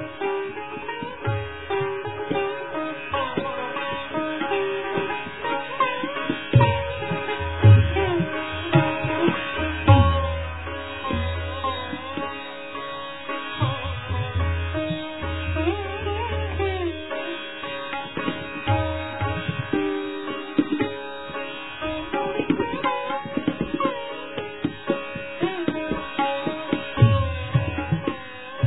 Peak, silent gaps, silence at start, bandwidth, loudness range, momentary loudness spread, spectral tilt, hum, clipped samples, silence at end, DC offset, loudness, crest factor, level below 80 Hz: -2 dBFS; none; 0 s; 4.1 kHz; 7 LU; 12 LU; -10.5 dB/octave; none; under 0.1%; 0 s; 0.5%; -25 LUFS; 22 dB; -40 dBFS